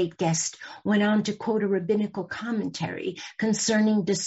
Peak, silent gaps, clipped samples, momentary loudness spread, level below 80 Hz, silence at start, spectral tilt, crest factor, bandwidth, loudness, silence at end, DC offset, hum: -12 dBFS; none; under 0.1%; 9 LU; -66 dBFS; 0 s; -4.5 dB/octave; 14 dB; 8.2 kHz; -26 LUFS; 0 s; under 0.1%; none